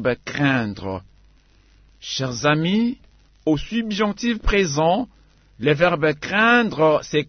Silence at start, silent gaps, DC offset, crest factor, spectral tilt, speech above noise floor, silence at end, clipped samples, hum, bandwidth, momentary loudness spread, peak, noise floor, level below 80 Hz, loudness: 0 s; none; under 0.1%; 18 dB; -5 dB/octave; 34 dB; 0.05 s; under 0.1%; none; 6.6 kHz; 13 LU; -2 dBFS; -54 dBFS; -36 dBFS; -20 LUFS